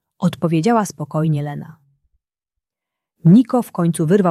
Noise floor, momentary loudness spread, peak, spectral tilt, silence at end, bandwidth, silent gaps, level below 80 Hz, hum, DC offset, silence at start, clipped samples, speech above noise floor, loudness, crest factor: -84 dBFS; 10 LU; -2 dBFS; -7.5 dB/octave; 0 s; 13 kHz; none; -60 dBFS; none; under 0.1%; 0.2 s; under 0.1%; 68 dB; -17 LUFS; 16 dB